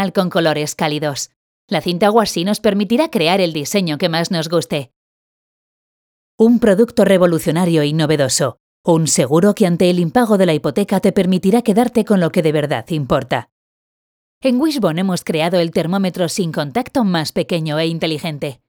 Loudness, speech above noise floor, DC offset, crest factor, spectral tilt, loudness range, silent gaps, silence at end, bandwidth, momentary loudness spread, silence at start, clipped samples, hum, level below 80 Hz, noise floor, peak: -16 LUFS; over 75 dB; under 0.1%; 16 dB; -5 dB/octave; 4 LU; 1.36-1.68 s, 4.96-6.38 s, 8.60-8.84 s, 13.52-14.41 s; 0.15 s; over 20 kHz; 7 LU; 0 s; under 0.1%; none; -52 dBFS; under -90 dBFS; 0 dBFS